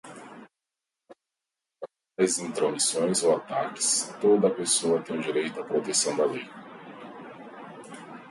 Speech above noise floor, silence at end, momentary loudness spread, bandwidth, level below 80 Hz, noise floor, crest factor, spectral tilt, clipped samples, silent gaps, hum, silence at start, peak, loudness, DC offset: 62 dB; 0 s; 21 LU; 12 kHz; -76 dBFS; -88 dBFS; 18 dB; -3 dB/octave; under 0.1%; none; none; 0.05 s; -10 dBFS; -25 LUFS; under 0.1%